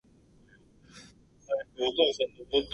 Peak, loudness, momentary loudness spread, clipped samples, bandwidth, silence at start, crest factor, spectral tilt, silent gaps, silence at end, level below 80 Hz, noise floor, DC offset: -10 dBFS; -29 LUFS; 26 LU; under 0.1%; 11 kHz; 0.95 s; 22 dB; -3.5 dB/octave; none; 0 s; -60 dBFS; -60 dBFS; under 0.1%